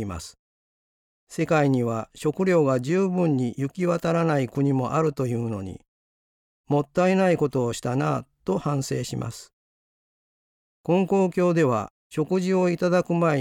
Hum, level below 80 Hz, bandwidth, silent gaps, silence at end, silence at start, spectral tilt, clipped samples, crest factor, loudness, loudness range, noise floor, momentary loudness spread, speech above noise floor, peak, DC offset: none; -58 dBFS; 16 kHz; 0.39-1.27 s, 5.88-6.64 s, 9.53-10.84 s, 11.90-12.10 s; 0 s; 0 s; -7 dB/octave; under 0.1%; 14 dB; -24 LUFS; 4 LU; under -90 dBFS; 11 LU; over 67 dB; -10 dBFS; under 0.1%